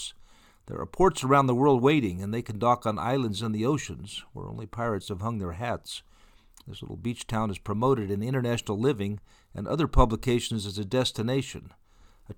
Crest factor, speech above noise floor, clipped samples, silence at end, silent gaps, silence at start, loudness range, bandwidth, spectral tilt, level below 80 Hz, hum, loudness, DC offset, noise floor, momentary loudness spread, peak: 22 dB; 29 dB; under 0.1%; 0.05 s; none; 0 s; 8 LU; 18.5 kHz; -6 dB/octave; -40 dBFS; none; -27 LUFS; under 0.1%; -56 dBFS; 17 LU; -6 dBFS